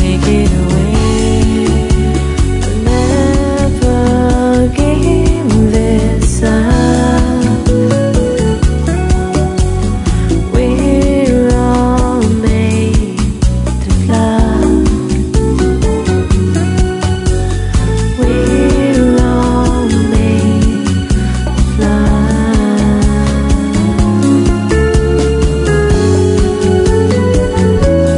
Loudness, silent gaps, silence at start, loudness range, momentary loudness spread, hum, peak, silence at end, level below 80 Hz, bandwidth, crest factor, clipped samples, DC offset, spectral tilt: -11 LUFS; none; 0 s; 2 LU; 4 LU; none; 0 dBFS; 0 s; -16 dBFS; 11 kHz; 10 dB; under 0.1%; under 0.1%; -6.5 dB/octave